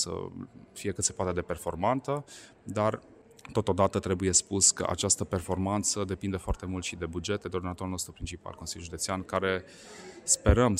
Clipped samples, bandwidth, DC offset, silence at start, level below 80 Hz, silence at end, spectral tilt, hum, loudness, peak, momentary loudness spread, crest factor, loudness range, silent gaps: under 0.1%; 16 kHz; under 0.1%; 0 s; -44 dBFS; 0 s; -3.5 dB/octave; none; -29 LUFS; -8 dBFS; 16 LU; 22 dB; 7 LU; none